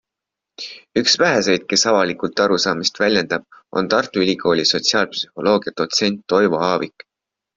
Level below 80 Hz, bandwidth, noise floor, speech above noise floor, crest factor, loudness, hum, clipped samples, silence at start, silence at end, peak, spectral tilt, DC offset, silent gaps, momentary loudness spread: -58 dBFS; 7.8 kHz; -84 dBFS; 66 dB; 16 dB; -18 LUFS; none; under 0.1%; 0.6 s; 0.7 s; -2 dBFS; -3 dB/octave; under 0.1%; none; 9 LU